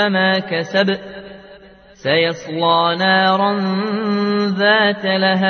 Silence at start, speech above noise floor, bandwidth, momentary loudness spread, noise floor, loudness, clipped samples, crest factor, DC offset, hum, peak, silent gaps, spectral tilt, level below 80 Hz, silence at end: 0 s; 27 dB; 6.6 kHz; 6 LU; -43 dBFS; -16 LUFS; under 0.1%; 16 dB; under 0.1%; none; 0 dBFS; none; -6 dB/octave; -60 dBFS; 0 s